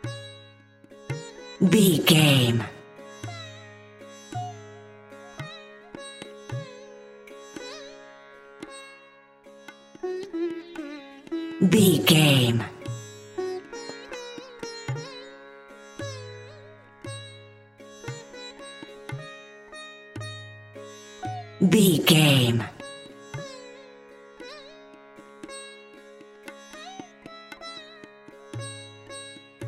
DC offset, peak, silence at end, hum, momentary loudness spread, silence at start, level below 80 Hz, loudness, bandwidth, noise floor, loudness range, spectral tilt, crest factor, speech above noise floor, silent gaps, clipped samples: under 0.1%; -4 dBFS; 0 s; none; 28 LU; 0.05 s; -64 dBFS; -23 LUFS; 16.5 kHz; -53 dBFS; 20 LU; -5 dB/octave; 24 dB; 35 dB; none; under 0.1%